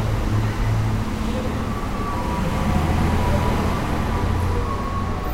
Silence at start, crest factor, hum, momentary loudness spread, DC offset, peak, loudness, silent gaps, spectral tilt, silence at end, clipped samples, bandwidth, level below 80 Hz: 0 s; 14 dB; none; 5 LU; under 0.1%; -8 dBFS; -23 LUFS; none; -6.5 dB/octave; 0 s; under 0.1%; 16 kHz; -26 dBFS